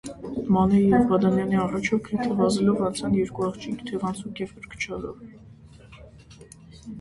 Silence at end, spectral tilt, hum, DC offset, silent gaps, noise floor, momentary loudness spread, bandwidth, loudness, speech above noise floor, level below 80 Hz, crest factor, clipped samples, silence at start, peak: 0 s; -6.5 dB/octave; none; under 0.1%; none; -48 dBFS; 16 LU; 11.5 kHz; -24 LUFS; 24 dB; -50 dBFS; 18 dB; under 0.1%; 0.05 s; -8 dBFS